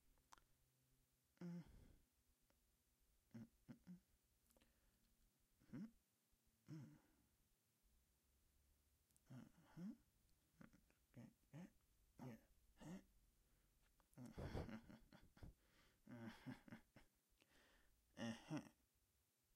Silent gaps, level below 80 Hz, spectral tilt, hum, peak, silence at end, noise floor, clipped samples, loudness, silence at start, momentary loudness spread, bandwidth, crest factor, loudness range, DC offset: none; -76 dBFS; -6 dB/octave; none; -36 dBFS; 0.8 s; -86 dBFS; under 0.1%; -60 LUFS; 0.05 s; 13 LU; 15.5 kHz; 26 dB; 7 LU; under 0.1%